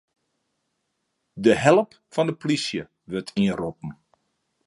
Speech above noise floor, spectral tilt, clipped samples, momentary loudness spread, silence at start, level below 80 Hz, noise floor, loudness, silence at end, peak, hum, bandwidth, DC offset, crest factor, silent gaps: 54 dB; -5.5 dB/octave; under 0.1%; 15 LU; 1.35 s; -58 dBFS; -76 dBFS; -23 LUFS; 0.75 s; -2 dBFS; none; 11.5 kHz; under 0.1%; 24 dB; none